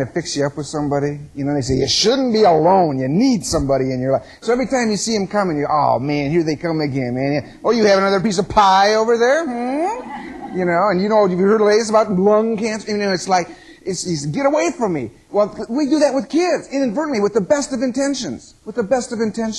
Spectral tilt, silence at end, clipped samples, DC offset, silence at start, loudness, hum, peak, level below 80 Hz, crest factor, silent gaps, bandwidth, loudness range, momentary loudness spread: -5 dB/octave; 0 s; under 0.1%; under 0.1%; 0 s; -17 LUFS; none; -2 dBFS; -46 dBFS; 16 dB; none; 12.5 kHz; 3 LU; 9 LU